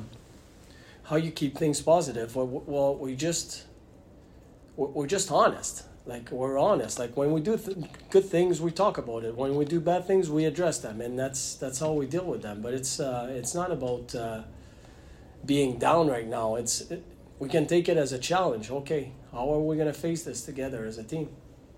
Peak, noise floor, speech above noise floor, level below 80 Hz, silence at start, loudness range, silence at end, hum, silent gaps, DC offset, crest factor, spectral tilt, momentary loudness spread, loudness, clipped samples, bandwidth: -10 dBFS; -52 dBFS; 25 dB; -54 dBFS; 0 s; 5 LU; 0.2 s; none; none; under 0.1%; 20 dB; -5 dB/octave; 12 LU; -28 LUFS; under 0.1%; 16 kHz